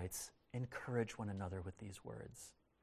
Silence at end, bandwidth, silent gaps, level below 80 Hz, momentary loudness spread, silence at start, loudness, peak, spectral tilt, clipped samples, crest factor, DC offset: 0.3 s; 16 kHz; none; -62 dBFS; 12 LU; 0 s; -47 LUFS; -26 dBFS; -5.5 dB/octave; under 0.1%; 22 dB; under 0.1%